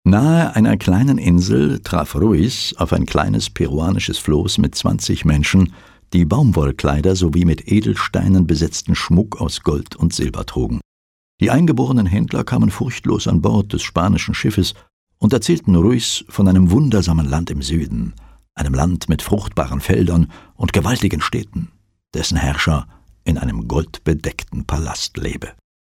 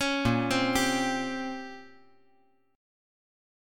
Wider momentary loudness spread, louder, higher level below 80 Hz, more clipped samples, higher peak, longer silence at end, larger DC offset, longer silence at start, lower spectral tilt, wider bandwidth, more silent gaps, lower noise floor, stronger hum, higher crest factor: second, 9 LU vs 16 LU; first, -17 LUFS vs -28 LUFS; first, -30 dBFS vs -52 dBFS; neither; first, -2 dBFS vs -12 dBFS; second, 0.35 s vs 1.85 s; neither; about the same, 0.05 s vs 0 s; first, -6 dB/octave vs -4 dB/octave; second, 15.5 kHz vs 17.5 kHz; first, 10.85-11.38 s, 14.93-15.07 s vs none; first, under -90 dBFS vs -68 dBFS; neither; second, 14 dB vs 20 dB